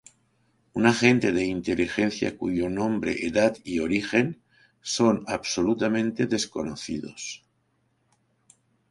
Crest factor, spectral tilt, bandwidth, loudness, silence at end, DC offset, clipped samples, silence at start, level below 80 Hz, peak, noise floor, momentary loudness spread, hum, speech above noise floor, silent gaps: 24 dB; -5 dB/octave; 11.5 kHz; -25 LUFS; 1.55 s; under 0.1%; under 0.1%; 0.75 s; -56 dBFS; -4 dBFS; -70 dBFS; 13 LU; none; 46 dB; none